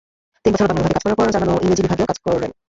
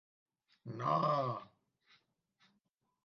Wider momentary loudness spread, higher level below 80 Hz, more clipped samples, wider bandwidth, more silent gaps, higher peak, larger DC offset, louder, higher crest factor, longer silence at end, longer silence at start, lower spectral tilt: second, 4 LU vs 17 LU; first, -40 dBFS vs -86 dBFS; neither; first, 8 kHz vs 6.8 kHz; neither; first, -4 dBFS vs -20 dBFS; neither; first, -18 LUFS vs -36 LUFS; second, 14 dB vs 20 dB; second, 0.15 s vs 1.6 s; second, 0.45 s vs 0.65 s; about the same, -6 dB/octave vs -6 dB/octave